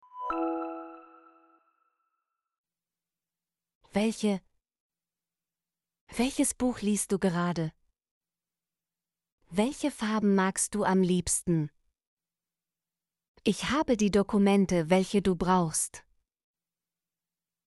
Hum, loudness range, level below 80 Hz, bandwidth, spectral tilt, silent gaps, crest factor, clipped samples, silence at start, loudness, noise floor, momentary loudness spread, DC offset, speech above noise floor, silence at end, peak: none; 9 LU; -56 dBFS; 11.5 kHz; -5 dB/octave; 2.58-2.64 s, 3.75-3.81 s, 4.80-4.90 s, 6.01-6.07 s, 8.11-8.21 s, 9.32-9.38 s, 12.07-12.17 s, 13.28-13.35 s; 20 dB; under 0.1%; 0.15 s; -28 LUFS; under -90 dBFS; 10 LU; under 0.1%; over 63 dB; 1.65 s; -12 dBFS